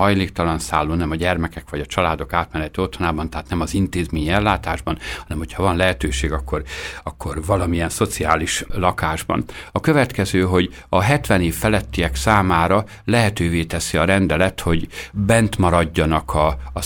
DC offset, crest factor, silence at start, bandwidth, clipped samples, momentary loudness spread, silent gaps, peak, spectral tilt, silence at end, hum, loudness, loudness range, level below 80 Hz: under 0.1%; 18 dB; 0 s; 18.5 kHz; under 0.1%; 9 LU; none; 0 dBFS; -5.5 dB/octave; 0 s; none; -20 LUFS; 4 LU; -32 dBFS